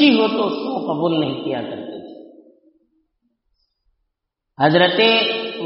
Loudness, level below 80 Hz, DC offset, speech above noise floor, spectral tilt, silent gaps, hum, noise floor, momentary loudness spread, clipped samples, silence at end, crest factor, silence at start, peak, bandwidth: -18 LUFS; -66 dBFS; under 0.1%; 61 dB; -2.5 dB/octave; none; none; -78 dBFS; 18 LU; under 0.1%; 0 s; 18 dB; 0 s; -2 dBFS; 5.8 kHz